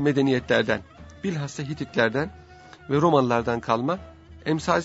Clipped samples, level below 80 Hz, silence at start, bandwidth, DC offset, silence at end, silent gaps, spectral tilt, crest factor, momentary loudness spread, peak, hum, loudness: under 0.1%; -52 dBFS; 0 s; 8 kHz; under 0.1%; 0 s; none; -6 dB/octave; 20 dB; 12 LU; -4 dBFS; none; -25 LUFS